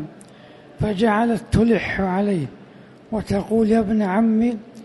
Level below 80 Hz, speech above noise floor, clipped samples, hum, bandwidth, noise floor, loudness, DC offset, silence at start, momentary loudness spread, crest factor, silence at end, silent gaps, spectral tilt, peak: -40 dBFS; 26 dB; under 0.1%; none; 11.5 kHz; -45 dBFS; -20 LUFS; under 0.1%; 0 s; 9 LU; 14 dB; 0 s; none; -7.5 dB/octave; -6 dBFS